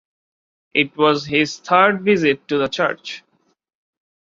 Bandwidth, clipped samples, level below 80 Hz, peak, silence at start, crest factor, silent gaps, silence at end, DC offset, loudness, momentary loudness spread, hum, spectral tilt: 7.6 kHz; under 0.1%; -60 dBFS; -2 dBFS; 0.75 s; 18 dB; none; 1.05 s; under 0.1%; -17 LUFS; 10 LU; none; -5 dB/octave